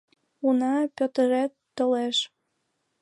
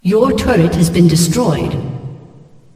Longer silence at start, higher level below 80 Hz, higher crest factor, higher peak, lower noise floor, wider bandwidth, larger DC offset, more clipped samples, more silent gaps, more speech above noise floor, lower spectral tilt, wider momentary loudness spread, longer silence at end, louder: first, 0.45 s vs 0.05 s; second, -80 dBFS vs -32 dBFS; about the same, 14 dB vs 14 dB; second, -12 dBFS vs 0 dBFS; first, -76 dBFS vs -40 dBFS; second, 11.5 kHz vs 16 kHz; neither; neither; neither; first, 52 dB vs 29 dB; second, -3 dB/octave vs -6 dB/octave; second, 6 LU vs 15 LU; first, 0.75 s vs 0.6 s; second, -25 LUFS vs -13 LUFS